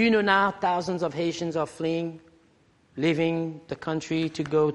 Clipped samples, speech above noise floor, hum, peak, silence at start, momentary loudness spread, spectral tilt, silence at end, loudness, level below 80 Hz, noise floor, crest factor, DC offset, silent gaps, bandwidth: under 0.1%; 36 dB; none; -6 dBFS; 0 s; 10 LU; -6 dB/octave; 0 s; -26 LUFS; -64 dBFS; -62 dBFS; 20 dB; under 0.1%; none; 11.5 kHz